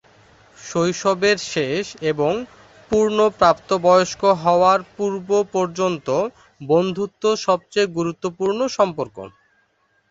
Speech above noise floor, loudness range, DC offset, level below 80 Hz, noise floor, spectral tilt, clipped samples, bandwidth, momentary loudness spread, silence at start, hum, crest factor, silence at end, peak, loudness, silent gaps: 45 dB; 4 LU; under 0.1%; -56 dBFS; -64 dBFS; -5 dB/octave; under 0.1%; 8 kHz; 11 LU; 0.6 s; none; 18 dB; 0.85 s; -2 dBFS; -20 LUFS; none